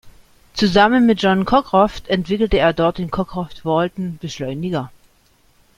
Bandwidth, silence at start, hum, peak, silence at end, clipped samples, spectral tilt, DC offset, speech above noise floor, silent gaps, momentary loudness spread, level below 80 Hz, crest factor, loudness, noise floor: 13 kHz; 0.05 s; none; -2 dBFS; 0.9 s; under 0.1%; -6 dB/octave; under 0.1%; 39 dB; none; 13 LU; -38 dBFS; 16 dB; -18 LUFS; -56 dBFS